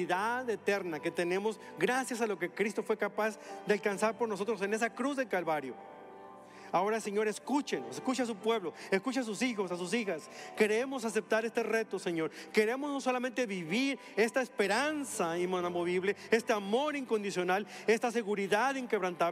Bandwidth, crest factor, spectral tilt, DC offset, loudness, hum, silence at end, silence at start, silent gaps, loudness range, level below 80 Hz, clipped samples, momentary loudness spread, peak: 15 kHz; 20 dB; -4 dB/octave; under 0.1%; -33 LUFS; none; 0 s; 0 s; none; 3 LU; -84 dBFS; under 0.1%; 6 LU; -14 dBFS